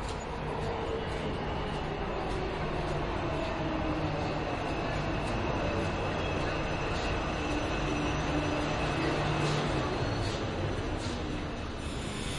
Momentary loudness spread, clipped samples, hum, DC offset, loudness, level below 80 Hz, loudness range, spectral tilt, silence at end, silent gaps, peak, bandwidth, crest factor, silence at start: 5 LU; under 0.1%; none; under 0.1%; -33 LUFS; -40 dBFS; 3 LU; -5.5 dB/octave; 0 s; none; -16 dBFS; 11.5 kHz; 16 dB; 0 s